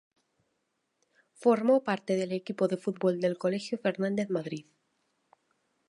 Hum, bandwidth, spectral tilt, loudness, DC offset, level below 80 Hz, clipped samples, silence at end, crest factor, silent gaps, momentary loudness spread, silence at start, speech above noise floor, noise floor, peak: none; 11.5 kHz; -6.5 dB/octave; -29 LUFS; under 0.1%; -82 dBFS; under 0.1%; 1.3 s; 20 dB; none; 8 LU; 1.4 s; 50 dB; -79 dBFS; -12 dBFS